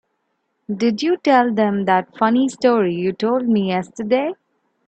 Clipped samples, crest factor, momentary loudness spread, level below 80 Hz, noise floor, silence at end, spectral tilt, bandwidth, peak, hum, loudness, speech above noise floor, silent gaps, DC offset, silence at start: under 0.1%; 16 dB; 7 LU; -64 dBFS; -71 dBFS; 0.55 s; -6.5 dB/octave; 8.8 kHz; -2 dBFS; none; -18 LUFS; 53 dB; none; under 0.1%; 0.7 s